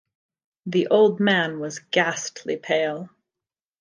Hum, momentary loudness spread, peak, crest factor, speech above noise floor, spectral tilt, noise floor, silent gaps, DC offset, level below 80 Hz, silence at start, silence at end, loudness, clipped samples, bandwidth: none; 15 LU; -6 dBFS; 18 dB; 68 dB; -4.5 dB/octave; -90 dBFS; none; under 0.1%; -76 dBFS; 0.65 s; 0.75 s; -22 LUFS; under 0.1%; 10 kHz